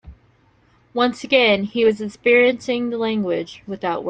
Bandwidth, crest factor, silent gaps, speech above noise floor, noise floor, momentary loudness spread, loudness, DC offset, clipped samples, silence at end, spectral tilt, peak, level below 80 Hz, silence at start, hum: 9 kHz; 18 dB; none; 38 dB; -57 dBFS; 11 LU; -19 LUFS; under 0.1%; under 0.1%; 0 s; -5 dB/octave; -2 dBFS; -54 dBFS; 0.05 s; none